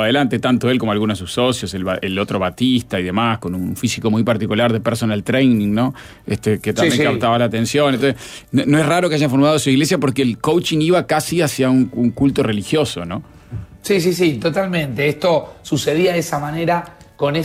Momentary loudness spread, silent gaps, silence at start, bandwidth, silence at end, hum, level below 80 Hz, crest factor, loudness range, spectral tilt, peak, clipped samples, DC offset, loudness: 7 LU; none; 0 s; 16 kHz; 0 s; none; -48 dBFS; 12 dB; 3 LU; -5.5 dB/octave; -4 dBFS; under 0.1%; under 0.1%; -17 LUFS